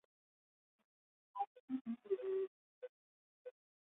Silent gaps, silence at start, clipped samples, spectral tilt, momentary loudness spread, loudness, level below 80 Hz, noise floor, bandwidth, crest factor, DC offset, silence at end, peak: 1.47-1.68 s, 1.81-1.85 s, 2.47-2.81 s, 2.89-3.45 s; 1.35 s; under 0.1%; -3 dB/octave; 18 LU; -45 LUFS; under -90 dBFS; under -90 dBFS; 3.9 kHz; 20 dB; under 0.1%; 0.35 s; -28 dBFS